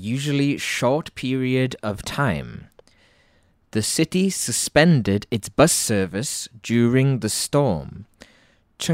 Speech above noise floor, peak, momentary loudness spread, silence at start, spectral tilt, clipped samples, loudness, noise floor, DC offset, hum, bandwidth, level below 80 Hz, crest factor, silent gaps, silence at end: 39 dB; -2 dBFS; 12 LU; 0 s; -4.5 dB/octave; under 0.1%; -21 LUFS; -60 dBFS; under 0.1%; none; 16 kHz; -50 dBFS; 20 dB; none; 0 s